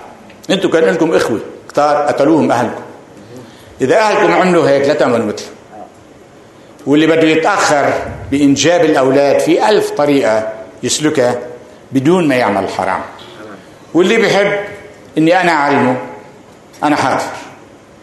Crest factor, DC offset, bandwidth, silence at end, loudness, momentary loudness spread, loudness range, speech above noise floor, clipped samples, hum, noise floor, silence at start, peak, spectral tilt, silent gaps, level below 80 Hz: 14 dB; under 0.1%; 12.5 kHz; 0.45 s; -12 LUFS; 16 LU; 4 LU; 28 dB; under 0.1%; none; -39 dBFS; 0 s; 0 dBFS; -4.5 dB/octave; none; -50 dBFS